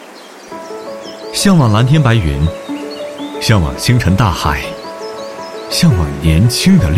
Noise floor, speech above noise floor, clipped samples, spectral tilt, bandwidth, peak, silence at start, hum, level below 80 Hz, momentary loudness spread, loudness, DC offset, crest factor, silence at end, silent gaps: -34 dBFS; 23 dB; under 0.1%; -5.5 dB/octave; 16 kHz; 0 dBFS; 0 s; none; -28 dBFS; 17 LU; -13 LUFS; under 0.1%; 12 dB; 0 s; none